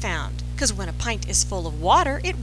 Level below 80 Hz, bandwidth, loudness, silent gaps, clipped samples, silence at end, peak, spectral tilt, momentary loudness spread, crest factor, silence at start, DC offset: -30 dBFS; 11 kHz; -23 LUFS; none; under 0.1%; 0 s; -4 dBFS; -3 dB/octave; 9 LU; 18 dB; 0 s; under 0.1%